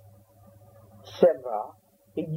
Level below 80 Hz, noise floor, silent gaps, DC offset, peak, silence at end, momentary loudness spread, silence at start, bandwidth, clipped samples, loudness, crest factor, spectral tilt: -70 dBFS; -55 dBFS; none; under 0.1%; -6 dBFS; 0 s; 19 LU; 1.05 s; 15.5 kHz; under 0.1%; -26 LUFS; 24 dB; -8 dB/octave